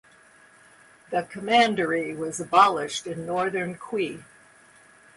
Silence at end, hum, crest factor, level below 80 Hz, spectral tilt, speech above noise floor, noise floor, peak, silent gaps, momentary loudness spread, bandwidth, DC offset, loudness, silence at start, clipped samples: 0.95 s; none; 22 dB; -68 dBFS; -4 dB/octave; 30 dB; -55 dBFS; -4 dBFS; none; 12 LU; 11.5 kHz; under 0.1%; -24 LUFS; 1.1 s; under 0.1%